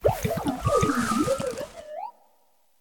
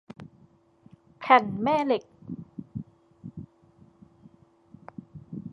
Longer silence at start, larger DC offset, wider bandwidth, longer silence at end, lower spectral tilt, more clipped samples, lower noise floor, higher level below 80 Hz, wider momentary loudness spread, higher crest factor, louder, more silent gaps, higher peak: second, 0 s vs 0.2 s; neither; first, 18 kHz vs 7.6 kHz; first, 0.7 s vs 0 s; second, -5.5 dB/octave vs -7 dB/octave; neither; first, -67 dBFS vs -60 dBFS; first, -44 dBFS vs -64 dBFS; second, 15 LU vs 26 LU; second, 18 dB vs 26 dB; about the same, -26 LUFS vs -24 LUFS; neither; second, -8 dBFS vs -4 dBFS